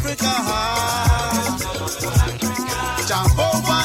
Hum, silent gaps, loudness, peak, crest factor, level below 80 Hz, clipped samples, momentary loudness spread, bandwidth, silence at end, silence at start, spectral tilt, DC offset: none; none; -20 LUFS; -4 dBFS; 16 dB; -28 dBFS; under 0.1%; 6 LU; 16.5 kHz; 0 s; 0 s; -4 dB/octave; under 0.1%